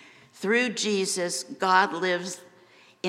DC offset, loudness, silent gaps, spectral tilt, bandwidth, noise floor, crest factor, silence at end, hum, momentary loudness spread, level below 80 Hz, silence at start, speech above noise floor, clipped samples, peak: under 0.1%; -25 LUFS; none; -2.5 dB/octave; 16 kHz; -56 dBFS; 20 dB; 0 s; none; 12 LU; -86 dBFS; 0.35 s; 30 dB; under 0.1%; -8 dBFS